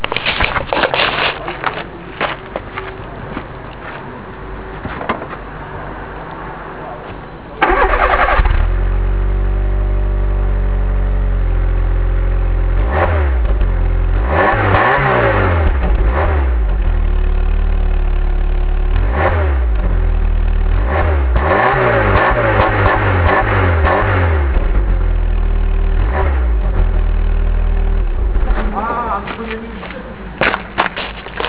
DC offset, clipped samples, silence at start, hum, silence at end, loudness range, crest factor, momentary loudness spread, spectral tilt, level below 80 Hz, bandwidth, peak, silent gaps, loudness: 0.4%; under 0.1%; 0 s; none; 0 s; 12 LU; 14 dB; 15 LU; -10 dB/octave; -16 dBFS; 4 kHz; 0 dBFS; none; -16 LUFS